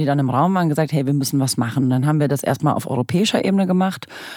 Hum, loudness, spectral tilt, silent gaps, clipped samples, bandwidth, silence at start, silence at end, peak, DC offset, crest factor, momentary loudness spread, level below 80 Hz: none; -19 LUFS; -6 dB/octave; none; under 0.1%; 18 kHz; 0 s; 0 s; -4 dBFS; under 0.1%; 14 dB; 3 LU; -62 dBFS